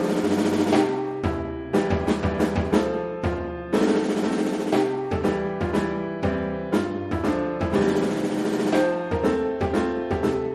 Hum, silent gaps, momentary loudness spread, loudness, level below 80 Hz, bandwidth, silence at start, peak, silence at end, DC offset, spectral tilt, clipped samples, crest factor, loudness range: none; none; 5 LU; -24 LUFS; -42 dBFS; 13 kHz; 0 s; -8 dBFS; 0 s; under 0.1%; -6.5 dB/octave; under 0.1%; 16 dB; 1 LU